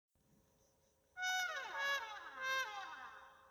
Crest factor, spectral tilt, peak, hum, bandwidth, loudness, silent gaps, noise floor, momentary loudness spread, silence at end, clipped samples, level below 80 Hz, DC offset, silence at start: 18 dB; 1.5 dB/octave; -26 dBFS; none; over 20 kHz; -41 LUFS; none; -76 dBFS; 16 LU; 0 s; under 0.1%; -84 dBFS; under 0.1%; 1.15 s